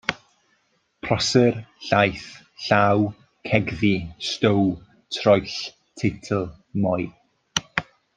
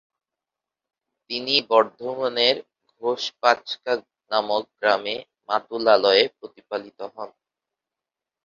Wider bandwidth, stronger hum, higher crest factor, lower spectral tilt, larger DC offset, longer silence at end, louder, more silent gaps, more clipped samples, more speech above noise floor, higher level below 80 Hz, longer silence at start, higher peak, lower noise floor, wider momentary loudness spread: first, 9.6 kHz vs 7.4 kHz; neither; about the same, 22 dB vs 22 dB; first, -5 dB/octave vs -3 dB/octave; neither; second, 0.35 s vs 1.15 s; about the same, -23 LUFS vs -22 LUFS; neither; neither; second, 46 dB vs 66 dB; first, -54 dBFS vs -72 dBFS; second, 0.1 s vs 1.3 s; about the same, -2 dBFS vs -2 dBFS; second, -67 dBFS vs -88 dBFS; about the same, 16 LU vs 14 LU